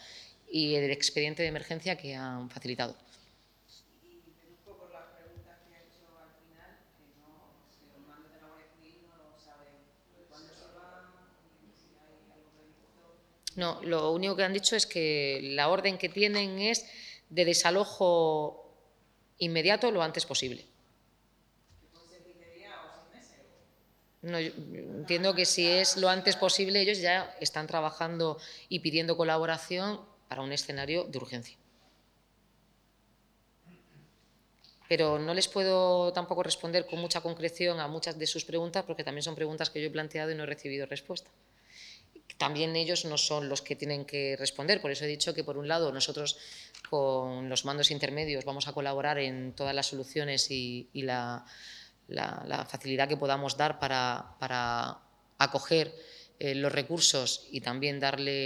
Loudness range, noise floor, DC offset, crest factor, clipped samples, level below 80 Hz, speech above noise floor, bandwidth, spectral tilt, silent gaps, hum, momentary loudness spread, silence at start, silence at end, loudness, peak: 11 LU; -68 dBFS; under 0.1%; 28 dB; under 0.1%; -70 dBFS; 37 dB; 19.5 kHz; -3 dB/octave; none; none; 15 LU; 0 s; 0 s; -30 LUFS; -4 dBFS